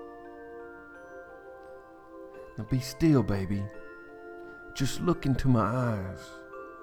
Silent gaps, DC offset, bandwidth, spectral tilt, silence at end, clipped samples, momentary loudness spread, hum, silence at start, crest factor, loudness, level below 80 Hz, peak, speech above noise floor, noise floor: none; under 0.1%; 18.5 kHz; -7 dB/octave; 0 s; under 0.1%; 22 LU; none; 0 s; 20 dB; -29 LUFS; -46 dBFS; -12 dBFS; 21 dB; -49 dBFS